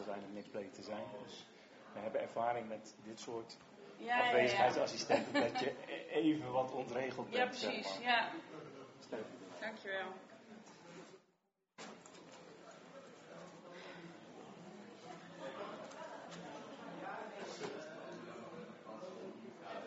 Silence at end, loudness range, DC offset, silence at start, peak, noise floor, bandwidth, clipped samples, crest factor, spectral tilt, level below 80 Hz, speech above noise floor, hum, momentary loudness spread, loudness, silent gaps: 0 s; 19 LU; under 0.1%; 0 s; -18 dBFS; -81 dBFS; 7.6 kHz; under 0.1%; 24 dB; -2 dB/octave; -84 dBFS; 42 dB; none; 21 LU; -40 LUFS; none